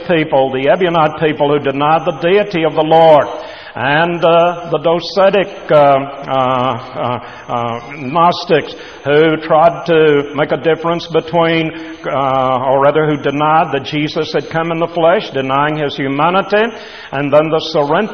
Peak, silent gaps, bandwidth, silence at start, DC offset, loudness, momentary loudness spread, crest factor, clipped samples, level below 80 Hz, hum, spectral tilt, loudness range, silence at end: 0 dBFS; none; 6.6 kHz; 0 s; 0.4%; -13 LUFS; 9 LU; 12 dB; under 0.1%; -50 dBFS; none; -6.5 dB/octave; 3 LU; 0 s